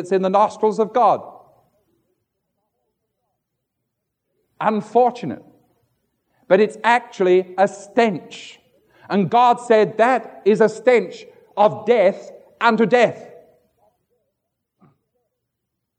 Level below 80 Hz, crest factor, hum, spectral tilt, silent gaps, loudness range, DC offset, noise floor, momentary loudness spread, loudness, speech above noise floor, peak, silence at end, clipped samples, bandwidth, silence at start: -76 dBFS; 18 dB; none; -6 dB/octave; none; 7 LU; under 0.1%; -78 dBFS; 15 LU; -17 LUFS; 61 dB; -2 dBFS; 2.75 s; under 0.1%; 9.4 kHz; 0 s